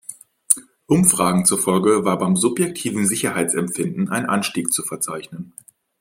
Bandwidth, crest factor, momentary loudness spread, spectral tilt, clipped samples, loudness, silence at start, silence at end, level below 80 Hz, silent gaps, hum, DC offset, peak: 16.5 kHz; 20 dB; 10 LU; -4 dB/octave; under 0.1%; -19 LUFS; 0.1 s; 0.5 s; -58 dBFS; none; none; under 0.1%; 0 dBFS